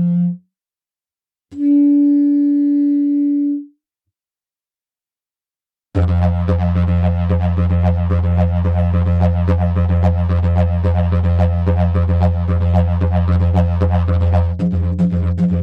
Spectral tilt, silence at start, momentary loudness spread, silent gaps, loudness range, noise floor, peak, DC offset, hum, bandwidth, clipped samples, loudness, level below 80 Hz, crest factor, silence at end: -10.5 dB/octave; 0 s; 4 LU; none; 5 LU; under -90 dBFS; -4 dBFS; under 0.1%; none; 4.1 kHz; under 0.1%; -16 LUFS; -26 dBFS; 12 dB; 0 s